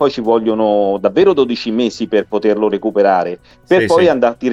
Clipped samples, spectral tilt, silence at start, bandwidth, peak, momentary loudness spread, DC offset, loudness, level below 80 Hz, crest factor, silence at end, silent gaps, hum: under 0.1%; -6 dB/octave; 0 s; 11 kHz; 0 dBFS; 6 LU; under 0.1%; -14 LUFS; -52 dBFS; 12 dB; 0 s; none; none